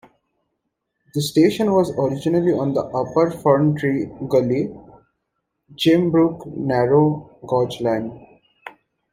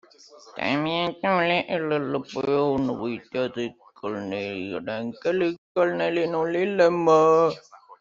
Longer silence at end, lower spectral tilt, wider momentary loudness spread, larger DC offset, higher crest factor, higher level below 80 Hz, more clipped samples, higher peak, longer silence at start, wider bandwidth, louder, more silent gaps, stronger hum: first, 0.4 s vs 0.05 s; about the same, -7 dB/octave vs -6 dB/octave; second, 9 LU vs 13 LU; neither; about the same, 18 dB vs 18 dB; first, -56 dBFS vs -64 dBFS; neither; first, -2 dBFS vs -6 dBFS; first, 1.15 s vs 0.45 s; first, 16 kHz vs 7.4 kHz; first, -19 LUFS vs -24 LUFS; second, none vs 5.58-5.75 s; neither